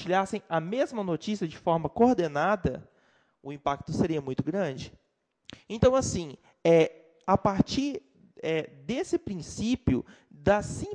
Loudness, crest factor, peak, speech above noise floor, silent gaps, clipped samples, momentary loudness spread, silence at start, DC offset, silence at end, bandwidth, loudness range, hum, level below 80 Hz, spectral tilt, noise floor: -28 LUFS; 20 dB; -8 dBFS; 39 dB; none; under 0.1%; 14 LU; 0 s; under 0.1%; 0 s; 10 kHz; 4 LU; none; -50 dBFS; -6 dB/octave; -66 dBFS